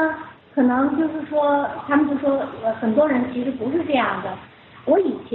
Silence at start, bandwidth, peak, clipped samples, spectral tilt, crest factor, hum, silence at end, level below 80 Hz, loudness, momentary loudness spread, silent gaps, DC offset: 0 s; 4.2 kHz; -6 dBFS; under 0.1%; -4.5 dB/octave; 14 dB; none; 0 s; -60 dBFS; -21 LUFS; 10 LU; none; under 0.1%